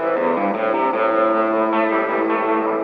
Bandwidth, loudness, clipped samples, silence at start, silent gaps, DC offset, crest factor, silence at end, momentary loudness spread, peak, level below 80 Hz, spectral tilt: 5 kHz; -19 LUFS; under 0.1%; 0 s; none; under 0.1%; 12 dB; 0 s; 2 LU; -8 dBFS; -62 dBFS; -8 dB/octave